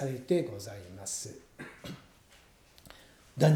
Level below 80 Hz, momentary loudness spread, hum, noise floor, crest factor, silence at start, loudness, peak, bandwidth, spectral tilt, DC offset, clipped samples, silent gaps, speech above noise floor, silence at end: -66 dBFS; 23 LU; none; -60 dBFS; 22 dB; 0 s; -35 LUFS; -12 dBFS; 16.5 kHz; -6 dB/octave; under 0.1%; under 0.1%; none; 25 dB; 0 s